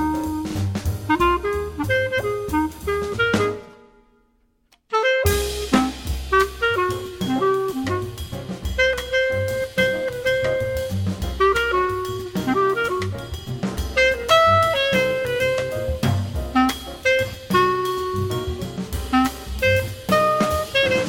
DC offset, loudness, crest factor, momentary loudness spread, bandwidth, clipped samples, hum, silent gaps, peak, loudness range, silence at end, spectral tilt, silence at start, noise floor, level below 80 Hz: under 0.1%; -21 LUFS; 18 dB; 8 LU; 17 kHz; under 0.1%; none; none; -4 dBFS; 4 LU; 0 s; -5 dB/octave; 0 s; -63 dBFS; -36 dBFS